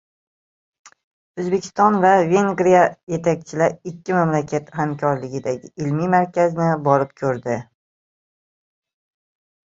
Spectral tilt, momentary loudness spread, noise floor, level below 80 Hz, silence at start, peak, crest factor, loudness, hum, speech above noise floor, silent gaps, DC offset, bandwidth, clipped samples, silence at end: -7 dB/octave; 11 LU; under -90 dBFS; -60 dBFS; 1.35 s; -2 dBFS; 18 dB; -19 LUFS; none; over 71 dB; 3.03-3.07 s; under 0.1%; 7.8 kHz; under 0.1%; 2.1 s